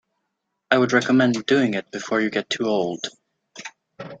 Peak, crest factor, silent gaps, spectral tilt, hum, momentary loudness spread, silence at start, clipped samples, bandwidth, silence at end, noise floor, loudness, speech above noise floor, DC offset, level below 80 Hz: -2 dBFS; 22 dB; none; -5 dB/octave; none; 20 LU; 0.7 s; under 0.1%; 8 kHz; 0.05 s; -78 dBFS; -21 LUFS; 57 dB; under 0.1%; -66 dBFS